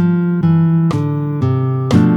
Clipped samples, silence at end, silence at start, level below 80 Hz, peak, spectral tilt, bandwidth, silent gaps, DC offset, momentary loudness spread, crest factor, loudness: under 0.1%; 0 s; 0 s; -48 dBFS; 0 dBFS; -9 dB/octave; 8 kHz; none; under 0.1%; 5 LU; 14 dB; -15 LUFS